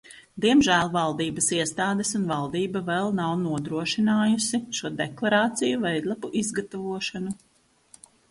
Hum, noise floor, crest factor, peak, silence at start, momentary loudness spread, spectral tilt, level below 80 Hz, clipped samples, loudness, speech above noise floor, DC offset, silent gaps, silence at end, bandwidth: none; -57 dBFS; 18 dB; -8 dBFS; 0.1 s; 9 LU; -4 dB/octave; -60 dBFS; under 0.1%; -25 LUFS; 32 dB; under 0.1%; none; 0.95 s; 11.5 kHz